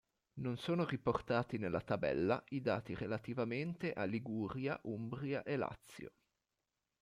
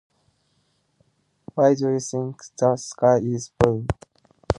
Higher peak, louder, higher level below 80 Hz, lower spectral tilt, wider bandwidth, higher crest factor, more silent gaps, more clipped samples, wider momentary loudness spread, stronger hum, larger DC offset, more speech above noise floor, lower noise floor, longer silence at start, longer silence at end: second, -22 dBFS vs 0 dBFS; second, -40 LUFS vs -22 LUFS; second, -68 dBFS vs -44 dBFS; about the same, -7.5 dB/octave vs -6.5 dB/octave; first, 15 kHz vs 11 kHz; second, 18 dB vs 24 dB; neither; neither; second, 8 LU vs 12 LU; neither; neither; about the same, 50 dB vs 47 dB; first, -89 dBFS vs -68 dBFS; second, 0.35 s vs 1.55 s; first, 0.95 s vs 0.05 s